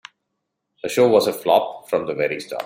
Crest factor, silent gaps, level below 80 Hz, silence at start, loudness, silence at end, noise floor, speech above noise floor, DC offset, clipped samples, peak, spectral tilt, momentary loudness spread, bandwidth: 18 dB; none; -66 dBFS; 0.85 s; -19 LUFS; 0 s; -77 dBFS; 58 dB; under 0.1%; under 0.1%; -2 dBFS; -4.5 dB/octave; 9 LU; 16.5 kHz